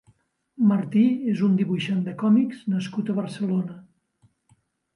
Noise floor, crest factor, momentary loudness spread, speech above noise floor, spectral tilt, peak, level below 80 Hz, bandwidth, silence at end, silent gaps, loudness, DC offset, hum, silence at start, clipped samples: -64 dBFS; 14 dB; 7 LU; 42 dB; -8 dB/octave; -10 dBFS; -72 dBFS; 11 kHz; 1.15 s; none; -23 LUFS; under 0.1%; none; 0.6 s; under 0.1%